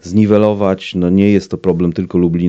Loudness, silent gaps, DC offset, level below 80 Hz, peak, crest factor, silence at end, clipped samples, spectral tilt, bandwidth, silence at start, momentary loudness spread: -13 LUFS; none; under 0.1%; -44 dBFS; 0 dBFS; 12 dB; 0 s; 0.2%; -8 dB/octave; 7.8 kHz; 0.05 s; 5 LU